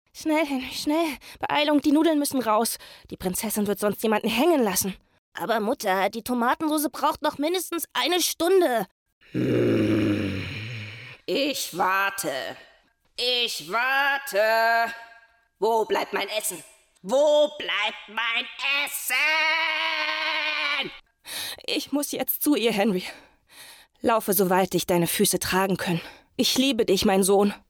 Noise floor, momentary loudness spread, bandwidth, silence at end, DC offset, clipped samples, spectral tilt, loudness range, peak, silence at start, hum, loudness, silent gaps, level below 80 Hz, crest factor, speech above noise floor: -61 dBFS; 12 LU; over 20 kHz; 0.15 s; under 0.1%; under 0.1%; -3.5 dB/octave; 3 LU; -10 dBFS; 0.15 s; none; -24 LUFS; 5.18-5.32 s, 8.91-9.06 s, 9.12-9.21 s; -58 dBFS; 14 dB; 37 dB